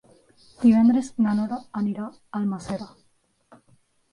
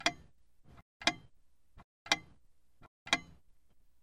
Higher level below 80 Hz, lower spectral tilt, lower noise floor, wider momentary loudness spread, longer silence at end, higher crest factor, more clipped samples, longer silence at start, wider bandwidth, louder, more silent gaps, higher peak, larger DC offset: first, -60 dBFS vs -66 dBFS; first, -7.5 dB/octave vs -1 dB/octave; about the same, -66 dBFS vs -68 dBFS; second, 16 LU vs 22 LU; first, 1.25 s vs 0.8 s; second, 18 dB vs 30 dB; neither; first, 0.6 s vs 0 s; second, 11 kHz vs 16 kHz; first, -23 LUFS vs -34 LUFS; second, none vs 0.82-1.00 s, 1.84-2.06 s, 2.88-3.06 s; about the same, -8 dBFS vs -10 dBFS; neither